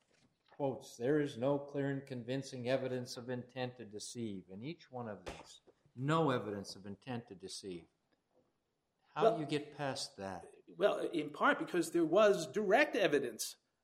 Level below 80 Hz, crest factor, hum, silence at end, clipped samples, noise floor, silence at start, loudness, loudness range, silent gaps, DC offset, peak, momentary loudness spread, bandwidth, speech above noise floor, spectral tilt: -74 dBFS; 22 dB; none; 0.3 s; under 0.1%; -84 dBFS; 0.6 s; -37 LUFS; 9 LU; none; under 0.1%; -14 dBFS; 17 LU; 16 kHz; 47 dB; -5 dB/octave